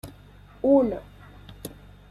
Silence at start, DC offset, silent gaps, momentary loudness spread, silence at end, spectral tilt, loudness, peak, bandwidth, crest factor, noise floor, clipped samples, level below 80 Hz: 0.05 s; under 0.1%; none; 21 LU; 0.4 s; -7 dB/octave; -23 LUFS; -8 dBFS; 14 kHz; 20 dB; -49 dBFS; under 0.1%; -50 dBFS